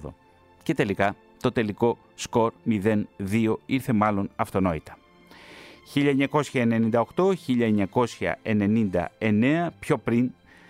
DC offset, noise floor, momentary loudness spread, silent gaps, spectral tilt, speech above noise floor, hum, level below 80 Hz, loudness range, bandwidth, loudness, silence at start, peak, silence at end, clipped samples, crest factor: under 0.1%; -56 dBFS; 7 LU; none; -7 dB/octave; 32 dB; none; -56 dBFS; 3 LU; 15.5 kHz; -25 LUFS; 0 s; -8 dBFS; 0.4 s; under 0.1%; 18 dB